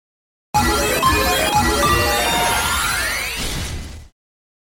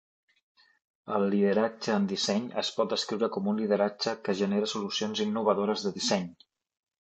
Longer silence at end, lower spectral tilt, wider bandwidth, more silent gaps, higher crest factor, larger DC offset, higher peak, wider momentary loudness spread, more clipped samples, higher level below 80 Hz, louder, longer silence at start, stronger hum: about the same, 0.6 s vs 0.7 s; second, -3 dB/octave vs -4.5 dB/octave; first, 17 kHz vs 8.6 kHz; neither; about the same, 14 dB vs 18 dB; neither; first, -4 dBFS vs -12 dBFS; first, 10 LU vs 5 LU; neither; first, -30 dBFS vs -74 dBFS; first, -17 LUFS vs -29 LUFS; second, 0.55 s vs 1.05 s; neither